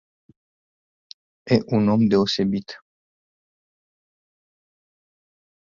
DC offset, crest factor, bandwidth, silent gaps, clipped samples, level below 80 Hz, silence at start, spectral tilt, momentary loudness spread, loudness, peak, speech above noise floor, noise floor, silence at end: under 0.1%; 22 dB; 7.4 kHz; none; under 0.1%; -58 dBFS; 1.45 s; -7 dB/octave; 23 LU; -20 LUFS; -4 dBFS; over 70 dB; under -90 dBFS; 2.9 s